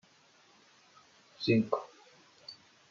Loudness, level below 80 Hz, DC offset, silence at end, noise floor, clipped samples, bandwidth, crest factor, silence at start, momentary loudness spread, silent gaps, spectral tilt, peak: -32 LUFS; -82 dBFS; under 0.1%; 0.4 s; -64 dBFS; under 0.1%; 7.4 kHz; 24 dB; 1.4 s; 24 LU; none; -5 dB/octave; -12 dBFS